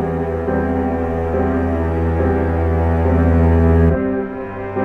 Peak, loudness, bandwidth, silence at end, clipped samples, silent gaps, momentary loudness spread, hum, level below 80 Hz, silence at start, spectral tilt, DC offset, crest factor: -2 dBFS; -17 LUFS; 3.5 kHz; 0 s; under 0.1%; none; 7 LU; none; -28 dBFS; 0 s; -10.5 dB/octave; under 0.1%; 14 dB